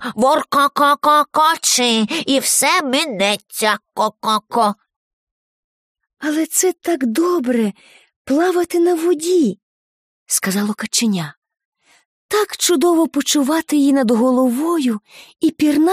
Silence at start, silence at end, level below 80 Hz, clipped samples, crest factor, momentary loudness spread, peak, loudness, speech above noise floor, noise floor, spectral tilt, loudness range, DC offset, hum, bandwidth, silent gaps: 0 s; 0 s; -64 dBFS; under 0.1%; 16 dB; 7 LU; -2 dBFS; -16 LUFS; over 74 dB; under -90 dBFS; -3 dB/octave; 6 LU; under 0.1%; none; 15.5 kHz; 4.96-5.95 s, 8.16-8.25 s, 9.63-10.26 s, 11.37-11.42 s, 11.65-11.72 s, 12.05-12.29 s